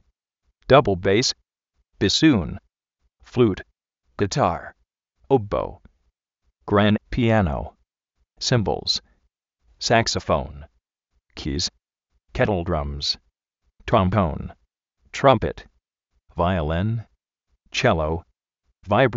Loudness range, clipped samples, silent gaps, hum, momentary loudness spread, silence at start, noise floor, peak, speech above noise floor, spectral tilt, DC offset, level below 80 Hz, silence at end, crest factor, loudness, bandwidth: 4 LU; under 0.1%; none; none; 17 LU; 0.7 s; -73 dBFS; -2 dBFS; 53 dB; -4.5 dB/octave; under 0.1%; -40 dBFS; 0 s; 22 dB; -22 LUFS; 8 kHz